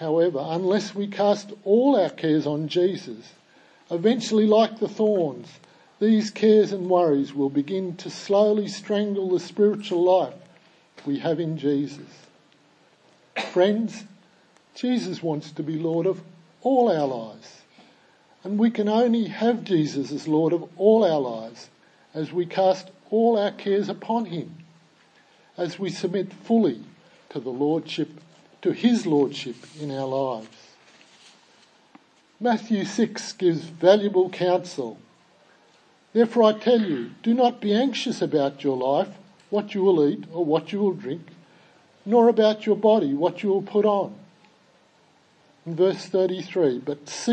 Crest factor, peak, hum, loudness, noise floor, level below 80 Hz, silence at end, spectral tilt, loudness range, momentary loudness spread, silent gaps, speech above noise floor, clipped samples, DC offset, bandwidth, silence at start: 20 dB; -4 dBFS; none; -23 LUFS; -59 dBFS; -80 dBFS; 0 s; -6 dB/octave; 6 LU; 14 LU; none; 37 dB; under 0.1%; under 0.1%; 9 kHz; 0 s